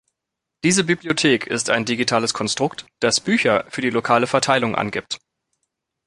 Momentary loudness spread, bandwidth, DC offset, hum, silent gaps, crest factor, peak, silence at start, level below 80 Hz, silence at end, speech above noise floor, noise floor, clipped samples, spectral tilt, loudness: 7 LU; 11.5 kHz; under 0.1%; none; none; 18 dB; -2 dBFS; 0.65 s; -58 dBFS; 0.9 s; 63 dB; -82 dBFS; under 0.1%; -3.5 dB/octave; -19 LUFS